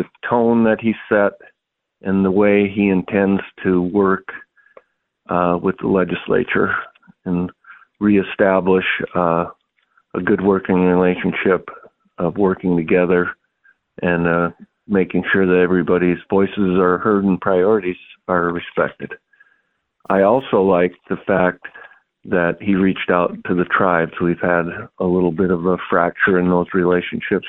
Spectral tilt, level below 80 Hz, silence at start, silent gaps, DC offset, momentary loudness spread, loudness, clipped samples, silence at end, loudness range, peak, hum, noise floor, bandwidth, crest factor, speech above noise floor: -10.5 dB/octave; -50 dBFS; 0 s; none; under 0.1%; 9 LU; -17 LUFS; under 0.1%; 0 s; 3 LU; -2 dBFS; none; -76 dBFS; 4 kHz; 16 dB; 60 dB